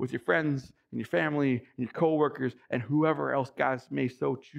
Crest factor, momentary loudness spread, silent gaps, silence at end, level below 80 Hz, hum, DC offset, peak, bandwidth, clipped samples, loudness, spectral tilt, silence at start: 18 dB; 9 LU; none; 0 s; -72 dBFS; none; under 0.1%; -12 dBFS; 11 kHz; under 0.1%; -29 LUFS; -8 dB/octave; 0 s